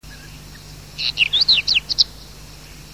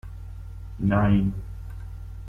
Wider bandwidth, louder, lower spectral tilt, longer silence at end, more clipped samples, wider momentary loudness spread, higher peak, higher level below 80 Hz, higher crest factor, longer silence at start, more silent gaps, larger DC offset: first, 16 kHz vs 3.6 kHz; first, -16 LUFS vs -24 LUFS; second, -0.5 dB/octave vs -9.5 dB/octave; about the same, 0 s vs 0 s; neither; first, 25 LU vs 20 LU; first, -2 dBFS vs -8 dBFS; second, -44 dBFS vs -38 dBFS; about the same, 20 dB vs 18 dB; about the same, 0.05 s vs 0.05 s; neither; first, 0.3% vs under 0.1%